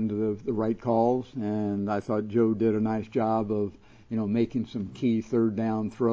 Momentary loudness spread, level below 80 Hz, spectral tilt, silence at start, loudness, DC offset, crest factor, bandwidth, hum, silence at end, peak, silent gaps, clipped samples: 7 LU; -58 dBFS; -9 dB/octave; 0 s; -28 LUFS; under 0.1%; 16 dB; 7.4 kHz; none; 0 s; -12 dBFS; none; under 0.1%